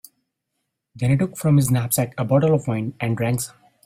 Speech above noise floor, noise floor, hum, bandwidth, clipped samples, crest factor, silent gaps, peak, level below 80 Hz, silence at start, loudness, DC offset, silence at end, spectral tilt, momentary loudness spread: 58 dB; -78 dBFS; none; 16 kHz; under 0.1%; 16 dB; none; -6 dBFS; -54 dBFS; 0.95 s; -21 LUFS; under 0.1%; 0.35 s; -6.5 dB/octave; 8 LU